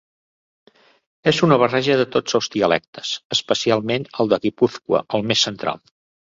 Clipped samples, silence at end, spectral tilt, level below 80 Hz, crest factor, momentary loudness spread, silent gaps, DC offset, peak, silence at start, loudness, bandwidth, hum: under 0.1%; 0.55 s; -4.5 dB/octave; -58 dBFS; 20 dB; 9 LU; 2.88-2.93 s, 3.25-3.30 s; under 0.1%; 0 dBFS; 1.25 s; -19 LUFS; 7.8 kHz; none